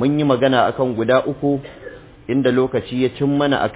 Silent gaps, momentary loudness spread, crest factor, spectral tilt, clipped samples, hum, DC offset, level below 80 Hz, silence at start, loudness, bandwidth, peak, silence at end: none; 17 LU; 16 dB; -11 dB/octave; under 0.1%; none; under 0.1%; -48 dBFS; 0 s; -18 LUFS; 4 kHz; -2 dBFS; 0 s